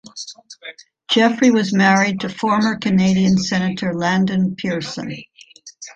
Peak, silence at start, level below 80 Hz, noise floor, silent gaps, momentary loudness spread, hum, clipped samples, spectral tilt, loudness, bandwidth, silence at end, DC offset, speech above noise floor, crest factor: -2 dBFS; 0.05 s; -54 dBFS; -44 dBFS; none; 20 LU; none; under 0.1%; -5 dB/octave; -17 LUFS; 7.8 kHz; 0.05 s; under 0.1%; 27 dB; 16 dB